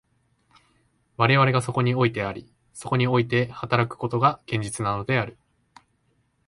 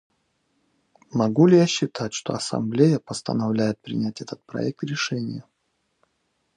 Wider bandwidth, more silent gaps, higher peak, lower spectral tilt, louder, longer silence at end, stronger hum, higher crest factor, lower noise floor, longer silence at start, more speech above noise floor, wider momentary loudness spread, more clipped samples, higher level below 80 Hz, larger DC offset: about the same, 11.5 kHz vs 10.5 kHz; neither; about the same, -2 dBFS vs -4 dBFS; about the same, -6 dB/octave vs -6 dB/octave; about the same, -23 LUFS vs -23 LUFS; about the same, 1.15 s vs 1.15 s; neither; about the same, 22 dB vs 20 dB; second, -68 dBFS vs -73 dBFS; about the same, 1.2 s vs 1.15 s; second, 45 dB vs 51 dB; about the same, 14 LU vs 13 LU; neither; first, -56 dBFS vs -64 dBFS; neither